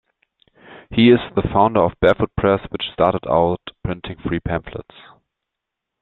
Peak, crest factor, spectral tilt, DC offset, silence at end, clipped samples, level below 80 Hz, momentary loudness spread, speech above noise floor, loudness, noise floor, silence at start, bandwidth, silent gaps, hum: -2 dBFS; 18 dB; -9 dB/octave; under 0.1%; 1.2 s; under 0.1%; -40 dBFS; 14 LU; 64 dB; -18 LUFS; -82 dBFS; 0.7 s; 4.3 kHz; none; none